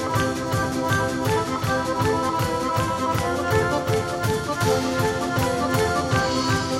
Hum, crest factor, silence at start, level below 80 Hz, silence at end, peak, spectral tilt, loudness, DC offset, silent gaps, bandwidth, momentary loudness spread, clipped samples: none; 14 dB; 0 s; -42 dBFS; 0 s; -8 dBFS; -5 dB/octave; -23 LUFS; under 0.1%; none; 16 kHz; 2 LU; under 0.1%